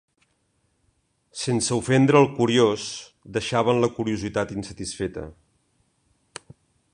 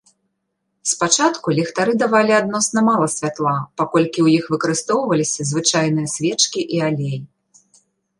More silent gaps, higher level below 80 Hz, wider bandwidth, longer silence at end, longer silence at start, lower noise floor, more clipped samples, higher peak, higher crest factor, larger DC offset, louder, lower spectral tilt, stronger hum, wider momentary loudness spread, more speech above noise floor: neither; first, -54 dBFS vs -64 dBFS; about the same, 11.5 kHz vs 11.5 kHz; first, 1.6 s vs 0.95 s; first, 1.35 s vs 0.85 s; second, -69 dBFS vs -73 dBFS; neither; about the same, -2 dBFS vs 0 dBFS; about the same, 22 dB vs 18 dB; neither; second, -23 LUFS vs -18 LUFS; about the same, -5 dB/octave vs -4 dB/octave; neither; first, 23 LU vs 6 LU; second, 47 dB vs 56 dB